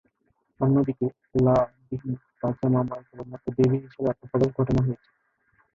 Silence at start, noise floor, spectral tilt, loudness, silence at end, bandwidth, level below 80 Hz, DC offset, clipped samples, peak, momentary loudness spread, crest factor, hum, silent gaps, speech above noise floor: 0.6 s; -71 dBFS; -10 dB/octave; -25 LUFS; 0.8 s; 7.2 kHz; -50 dBFS; under 0.1%; under 0.1%; -8 dBFS; 13 LU; 18 dB; none; none; 47 dB